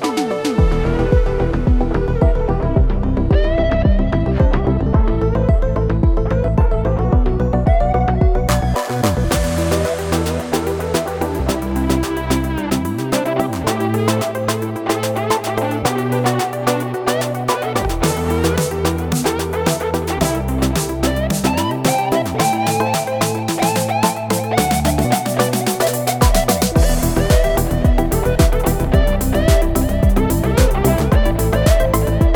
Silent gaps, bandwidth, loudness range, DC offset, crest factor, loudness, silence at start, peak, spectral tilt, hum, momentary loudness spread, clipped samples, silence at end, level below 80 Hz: none; over 20 kHz; 3 LU; under 0.1%; 16 dB; -17 LUFS; 0 s; 0 dBFS; -5.5 dB/octave; none; 4 LU; under 0.1%; 0 s; -20 dBFS